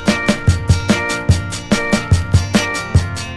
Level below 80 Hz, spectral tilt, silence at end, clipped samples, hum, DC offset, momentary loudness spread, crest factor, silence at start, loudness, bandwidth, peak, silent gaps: -22 dBFS; -5 dB/octave; 0 s; under 0.1%; none; under 0.1%; 3 LU; 16 dB; 0 s; -16 LUFS; 12.5 kHz; 0 dBFS; none